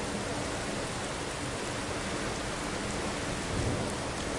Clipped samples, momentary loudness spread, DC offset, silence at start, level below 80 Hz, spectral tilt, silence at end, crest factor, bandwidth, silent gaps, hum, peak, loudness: under 0.1%; 2 LU; under 0.1%; 0 s; -46 dBFS; -4 dB/octave; 0 s; 14 dB; 11.5 kHz; none; none; -20 dBFS; -34 LUFS